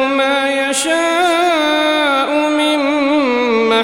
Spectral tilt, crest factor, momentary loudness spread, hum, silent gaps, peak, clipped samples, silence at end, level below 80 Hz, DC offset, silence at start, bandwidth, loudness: -2 dB/octave; 12 dB; 2 LU; none; none; -2 dBFS; under 0.1%; 0 s; -56 dBFS; 0.2%; 0 s; 16.5 kHz; -14 LUFS